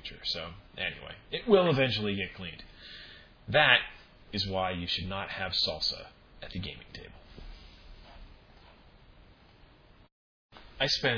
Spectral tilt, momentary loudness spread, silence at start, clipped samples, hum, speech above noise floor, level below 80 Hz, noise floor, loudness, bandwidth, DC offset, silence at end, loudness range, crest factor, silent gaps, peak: -4.5 dB/octave; 25 LU; 0 s; under 0.1%; none; 28 dB; -54 dBFS; -58 dBFS; -29 LUFS; 5.4 kHz; under 0.1%; 0 s; 19 LU; 26 dB; 10.12-10.49 s; -6 dBFS